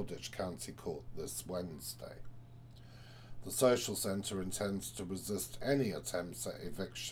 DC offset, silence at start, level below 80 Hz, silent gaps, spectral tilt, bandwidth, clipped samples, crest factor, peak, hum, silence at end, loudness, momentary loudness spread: under 0.1%; 0 s; -60 dBFS; none; -4 dB/octave; over 20 kHz; under 0.1%; 22 dB; -18 dBFS; none; 0 s; -38 LUFS; 22 LU